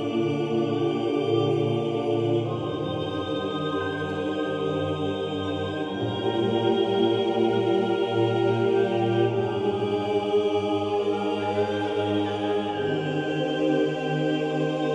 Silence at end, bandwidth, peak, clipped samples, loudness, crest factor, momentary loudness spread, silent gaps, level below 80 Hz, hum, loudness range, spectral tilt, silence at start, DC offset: 0 s; 9.4 kHz; -10 dBFS; under 0.1%; -25 LUFS; 14 dB; 5 LU; none; -64 dBFS; none; 4 LU; -7 dB/octave; 0 s; under 0.1%